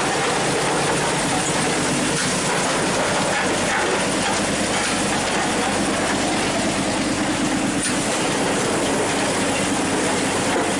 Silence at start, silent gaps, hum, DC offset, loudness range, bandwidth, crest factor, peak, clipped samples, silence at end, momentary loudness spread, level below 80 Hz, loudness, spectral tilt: 0 s; none; none; under 0.1%; 1 LU; 11.5 kHz; 12 dB; -10 dBFS; under 0.1%; 0 s; 1 LU; -46 dBFS; -20 LUFS; -3 dB/octave